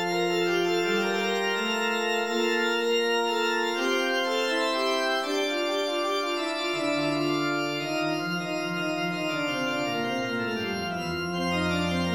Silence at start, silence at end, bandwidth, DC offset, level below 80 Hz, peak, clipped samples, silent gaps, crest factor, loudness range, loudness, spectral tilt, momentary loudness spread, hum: 0 s; 0 s; 17 kHz; 0.1%; -60 dBFS; -14 dBFS; under 0.1%; none; 12 dB; 3 LU; -26 LUFS; -4 dB/octave; 4 LU; none